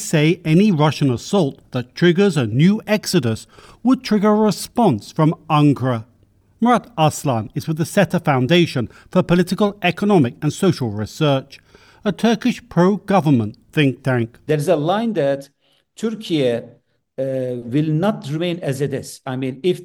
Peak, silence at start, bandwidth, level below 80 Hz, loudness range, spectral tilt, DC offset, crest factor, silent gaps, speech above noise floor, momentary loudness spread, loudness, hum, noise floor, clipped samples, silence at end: -4 dBFS; 0 s; 17 kHz; -54 dBFS; 5 LU; -6.5 dB/octave; under 0.1%; 14 dB; none; 38 dB; 9 LU; -18 LUFS; none; -55 dBFS; under 0.1%; 0 s